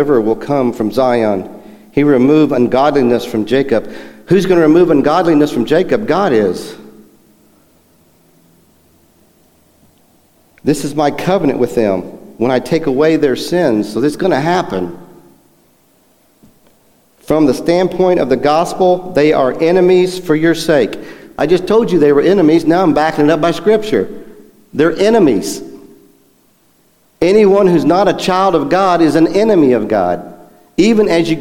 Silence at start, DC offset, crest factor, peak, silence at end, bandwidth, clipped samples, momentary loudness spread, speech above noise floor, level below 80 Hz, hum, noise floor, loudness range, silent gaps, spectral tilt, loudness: 0 s; under 0.1%; 12 dB; 0 dBFS; 0 s; 16.5 kHz; under 0.1%; 10 LU; 42 dB; -44 dBFS; none; -53 dBFS; 7 LU; none; -6.5 dB/octave; -12 LUFS